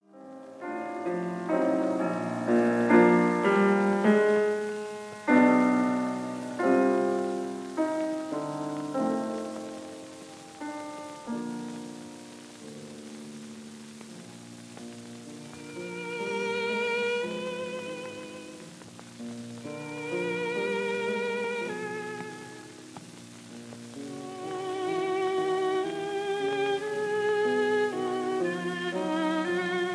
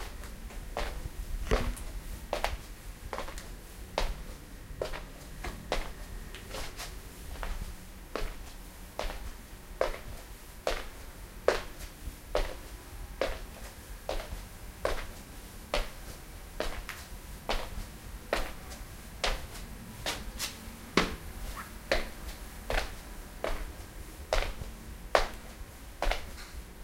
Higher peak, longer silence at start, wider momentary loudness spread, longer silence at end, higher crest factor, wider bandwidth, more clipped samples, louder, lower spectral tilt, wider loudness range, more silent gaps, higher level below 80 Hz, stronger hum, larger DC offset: about the same, -6 dBFS vs -6 dBFS; first, 0.15 s vs 0 s; first, 21 LU vs 14 LU; about the same, 0 s vs 0 s; second, 22 dB vs 30 dB; second, 11 kHz vs 16.5 kHz; neither; first, -28 LUFS vs -38 LUFS; first, -5.5 dB/octave vs -3.5 dB/octave; first, 16 LU vs 5 LU; neither; second, -78 dBFS vs -40 dBFS; neither; neither